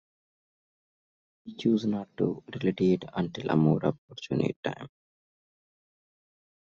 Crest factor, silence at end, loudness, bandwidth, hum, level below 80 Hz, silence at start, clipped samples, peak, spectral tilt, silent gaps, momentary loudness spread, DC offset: 20 dB; 1.9 s; -29 LUFS; 7.2 kHz; none; -66 dBFS; 1.45 s; under 0.1%; -12 dBFS; -7 dB/octave; 3.98-4.08 s, 4.56-4.63 s; 13 LU; under 0.1%